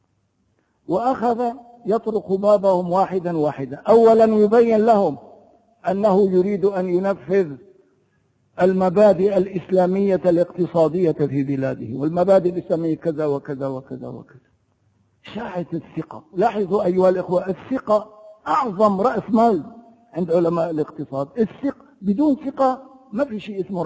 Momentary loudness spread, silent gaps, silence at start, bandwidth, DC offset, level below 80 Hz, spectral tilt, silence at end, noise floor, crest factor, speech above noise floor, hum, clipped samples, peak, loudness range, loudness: 14 LU; none; 0.9 s; 8 kHz; under 0.1%; -58 dBFS; -8.5 dB/octave; 0 s; -66 dBFS; 16 dB; 47 dB; none; under 0.1%; -2 dBFS; 7 LU; -20 LUFS